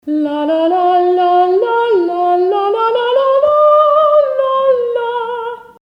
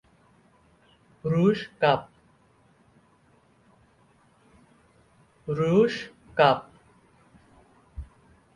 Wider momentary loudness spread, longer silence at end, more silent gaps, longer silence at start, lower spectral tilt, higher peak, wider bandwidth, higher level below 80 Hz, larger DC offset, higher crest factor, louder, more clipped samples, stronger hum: second, 8 LU vs 23 LU; second, 0.2 s vs 0.5 s; neither; second, 0.05 s vs 1.25 s; second, -5.5 dB/octave vs -7 dB/octave; first, -2 dBFS vs -6 dBFS; second, 5.6 kHz vs 11 kHz; about the same, -60 dBFS vs -56 dBFS; neither; second, 10 dB vs 24 dB; first, -12 LUFS vs -24 LUFS; neither; neither